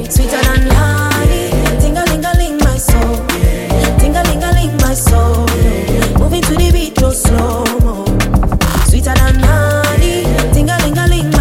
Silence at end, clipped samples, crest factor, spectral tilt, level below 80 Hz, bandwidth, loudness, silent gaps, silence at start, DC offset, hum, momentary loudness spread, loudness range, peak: 0 s; under 0.1%; 10 dB; -5 dB/octave; -14 dBFS; 17 kHz; -12 LUFS; none; 0 s; under 0.1%; none; 3 LU; 1 LU; 0 dBFS